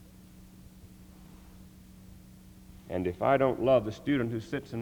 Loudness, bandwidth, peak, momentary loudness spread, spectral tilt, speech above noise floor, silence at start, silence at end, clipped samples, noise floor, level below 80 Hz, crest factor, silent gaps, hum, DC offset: -29 LUFS; over 20 kHz; -12 dBFS; 11 LU; -7.5 dB/octave; 24 dB; 0.2 s; 0 s; under 0.1%; -53 dBFS; -56 dBFS; 20 dB; none; none; under 0.1%